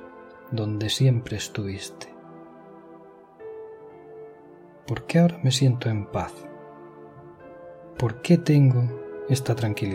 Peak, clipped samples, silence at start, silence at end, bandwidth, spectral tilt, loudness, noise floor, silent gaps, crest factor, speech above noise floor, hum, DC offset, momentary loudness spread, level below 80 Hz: -8 dBFS; under 0.1%; 0 s; 0 s; 15.5 kHz; -6 dB/octave; -24 LUFS; -48 dBFS; none; 18 dB; 26 dB; none; under 0.1%; 25 LU; -56 dBFS